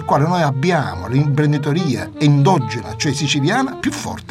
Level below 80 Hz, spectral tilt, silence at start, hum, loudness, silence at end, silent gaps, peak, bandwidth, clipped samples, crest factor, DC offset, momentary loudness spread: -48 dBFS; -6 dB/octave; 0 s; none; -17 LUFS; 0 s; none; -2 dBFS; 12.5 kHz; under 0.1%; 16 dB; under 0.1%; 8 LU